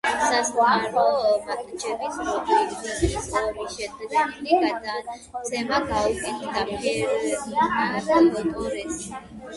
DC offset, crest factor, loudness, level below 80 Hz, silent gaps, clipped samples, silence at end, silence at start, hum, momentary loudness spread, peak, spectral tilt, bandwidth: under 0.1%; 18 dB; -24 LUFS; -44 dBFS; none; under 0.1%; 0 s; 0.05 s; none; 11 LU; -6 dBFS; -4 dB/octave; 11.5 kHz